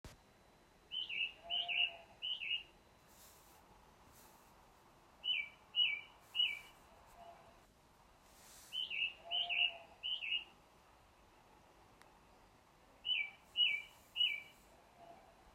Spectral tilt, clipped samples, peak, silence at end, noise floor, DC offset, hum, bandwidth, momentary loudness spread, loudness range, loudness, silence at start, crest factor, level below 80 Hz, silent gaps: -0.5 dB/octave; under 0.1%; -24 dBFS; 0.05 s; -67 dBFS; under 0.1%; none; 16 kHz; 25 LU; 7 LU; -38 LUFS; 0.05 s; 22 dB; -74 dBFS; none